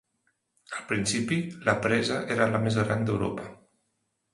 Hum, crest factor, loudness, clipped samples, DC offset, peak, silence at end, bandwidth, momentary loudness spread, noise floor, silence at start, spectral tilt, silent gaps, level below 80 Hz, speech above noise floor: none; 22 dB; -27 LUFS; under 0.1%; under 0.1%; -6 dBFS; 0.8 s; 11.5 kHz; 14 LU; -77 dBFS; 0.7 s; -5 dB/octave; none; -56 dBFS; 50 dB